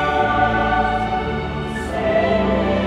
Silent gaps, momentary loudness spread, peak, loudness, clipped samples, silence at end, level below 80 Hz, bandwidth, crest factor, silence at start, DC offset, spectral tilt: none; 7 LU; -6 dBFS; -19 LUFS; under 0.1%; 0 s; -32 dBFS; 12 kHz; 14 dB; 0 s; under 0.1%; -6.5 dB/octave